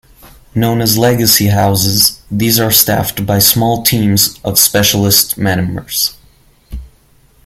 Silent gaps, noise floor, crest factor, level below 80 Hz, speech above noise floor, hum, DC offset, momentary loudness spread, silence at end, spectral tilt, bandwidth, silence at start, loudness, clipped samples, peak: none; -48 dBFS; 12 dB; -38 dBFS; 37 dB; none; under 0.1%; 8 LU; 0.6 s; -3.5 dB/octave; over 20 kHz; 0.25 s; -10 LUFS; 0.2%; 0 dBFS